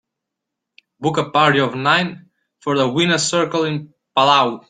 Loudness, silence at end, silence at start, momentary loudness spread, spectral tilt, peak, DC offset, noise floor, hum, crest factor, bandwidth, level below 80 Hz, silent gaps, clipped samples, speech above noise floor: -17 LUFS; 0.1 s; 1 s; 10 LU; -4 dB/octave; -2 dBFS; under 0.1%; -81 dBFS; none; 18 dB; 9.6 kHz; -60 dBFS; none; under 0.1%; 64 dB